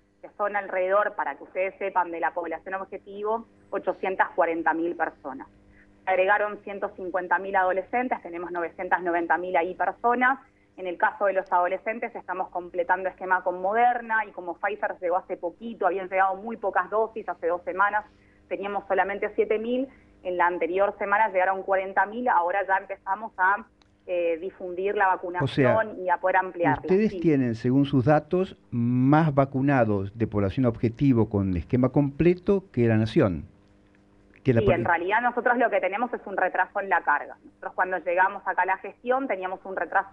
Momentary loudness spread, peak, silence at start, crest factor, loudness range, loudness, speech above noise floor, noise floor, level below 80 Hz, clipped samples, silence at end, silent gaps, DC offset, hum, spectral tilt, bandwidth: 10 LU; -8 dBFS; 0.25 s; 18 dB; 4 LU; -25 LUFS; 33 dB; -58 dBFS; -54 dBFS; under 0.1%; 0 s; none; under 0.1%; none; -9 dB/octave; 6.6 kHz